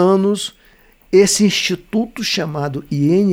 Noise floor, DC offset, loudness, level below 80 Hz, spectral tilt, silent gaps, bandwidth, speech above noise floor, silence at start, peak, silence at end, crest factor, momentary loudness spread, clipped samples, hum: -50 dBFS; under 0.1%; -16 LUFS; -50 dBFS; -4.5 dB/octave; none; 16 kHz; 35 dB; 0 s; -2 dBFS; 0 s; 14 dB; 10 LU; under 0.1%; none